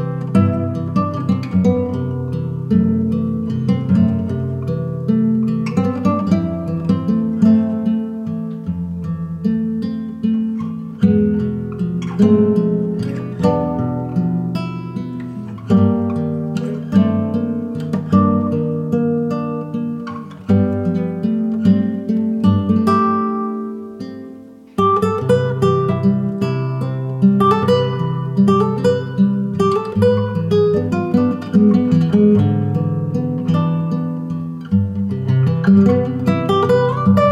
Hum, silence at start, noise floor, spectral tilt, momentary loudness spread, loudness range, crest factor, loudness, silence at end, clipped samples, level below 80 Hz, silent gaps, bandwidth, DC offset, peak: none; 0 s; -37 dBFS; -9 dB/octave; 10 LU; 4 LU; 14 dB; -17 LUFS; 0 s; under 0.1%; -48 dBFS; none; 9.2 kHz; under 0.1%; -2 dBFS